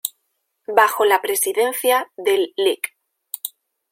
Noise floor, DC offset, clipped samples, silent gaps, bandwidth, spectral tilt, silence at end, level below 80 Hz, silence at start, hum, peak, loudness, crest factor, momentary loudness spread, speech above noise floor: -72 dBFS; under 0.1%; under 0.1%; none; 16.5 kHz; -0.5 dB/octave; 0.45 s; -76 dBFS; 0.05 s; none; 0 dBFS; -19 LUFS; 20 dB; 14 LU; 54 dB